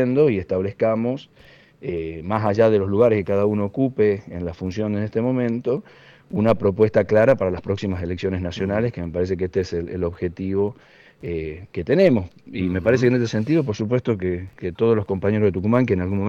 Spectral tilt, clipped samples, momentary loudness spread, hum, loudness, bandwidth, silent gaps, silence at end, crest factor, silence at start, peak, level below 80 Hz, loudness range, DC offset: -8 dB/octave; under 0.1%; 11 LU; none; -21 LUFS; 7.4 kHz; none; 0 s; 16 dB; 0 s; -4 dBFS; -48 dBFS; 4 LU; under 0.1%